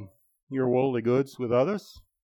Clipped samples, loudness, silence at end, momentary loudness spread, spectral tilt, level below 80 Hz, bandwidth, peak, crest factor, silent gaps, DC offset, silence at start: under 0.1%; -27 LUFS; 0.25 s; 8 LU; -8 dB/octave; -64 dBFS; 18.5 kHz; -14 dBFS; 14 dB; 0.43-0.47 s; under 0.1%; 0 s